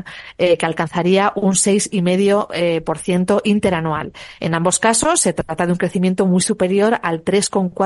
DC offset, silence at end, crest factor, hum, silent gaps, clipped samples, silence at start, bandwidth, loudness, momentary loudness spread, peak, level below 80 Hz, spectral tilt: under 0.1%; 0 s; 14 dB; none; none; under 0.1%; 0.05 s; 11.5 kHz; -17 LUFS; 6 LU; -2 dBFS; -48 dBFS; -4.5 dB/octave